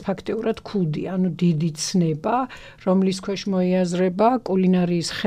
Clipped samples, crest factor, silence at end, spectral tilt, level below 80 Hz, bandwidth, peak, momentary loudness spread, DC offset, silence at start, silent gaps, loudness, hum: under 0.1%; 16 dB; 0 s; -6.5 dB/octave; -56 dBFS; 11 kHz; -6 dBFS; 6 LU; under 0.1%; 0 s; none; -22 LUFS; none